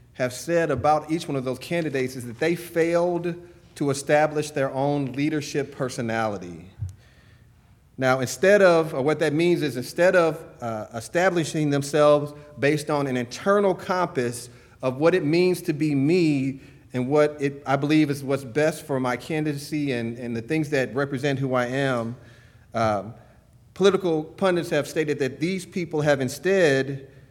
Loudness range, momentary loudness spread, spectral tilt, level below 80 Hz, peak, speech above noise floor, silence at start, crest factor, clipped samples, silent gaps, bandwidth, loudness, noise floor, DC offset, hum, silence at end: 5 LU; 11 LU; -6 dB/octave; -58 dBFS; -4 dBFS; 32 dB; 0.2 s; 18 dB; under 0.1%; none; 17.5 kHz; -23 LUFS; -55 dBFS; under 0.1%; none; 0.25 s